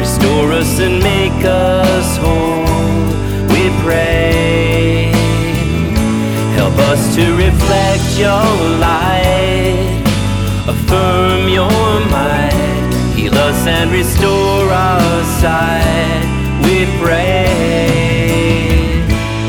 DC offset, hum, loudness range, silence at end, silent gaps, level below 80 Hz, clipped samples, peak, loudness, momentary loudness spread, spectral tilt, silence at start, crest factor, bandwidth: under 0.1%; none; 1 LU; 0 s; none; -20 dBFS; under 0.1%; 0 dBFS; -12 LUFS; 3 LU; -5.5 dB/octave; 0 s; 12 dB; over 20 kHz